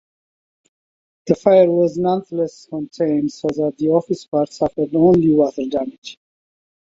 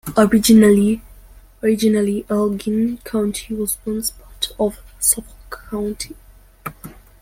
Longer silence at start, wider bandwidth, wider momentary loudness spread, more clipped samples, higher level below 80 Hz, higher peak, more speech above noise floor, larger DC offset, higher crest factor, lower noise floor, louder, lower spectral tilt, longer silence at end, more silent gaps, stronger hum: first, 1.25 s vs 0.05 s; second, 7.8 kHz vs 16.5 kHz; second, 16 LU vs 20 LU; neither; second, -54 dBFS vs -42 dBFS; about the same, -2 dBFS vs -2 dBFS; first, over 73 dB vs 27 dB; neither; about the same, 16 dB vs 18 dB; first, under -90 dBFS vs -44 dBFS; about the same, -18 LUFS vs -18 LUFS; first, -8 dB/octave vs -4.5 dB/octave; first, 0.8 s vs 0.3 s; first, 4.28-4.32 s, 5.98-6.02 s vs none; neither